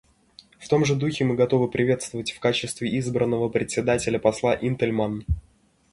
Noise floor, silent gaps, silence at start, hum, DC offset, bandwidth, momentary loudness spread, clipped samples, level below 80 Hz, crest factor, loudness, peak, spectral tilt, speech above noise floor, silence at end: -54 dBFS; none; 0.6 s; none; under 0.1%; 11.5 kHz; 6 LU; under 0.1%; -42 dBFS; 20 dB; -24 LUFS; -4 dBFS; -5.5 dB/octave; 31 dB; 0.5 s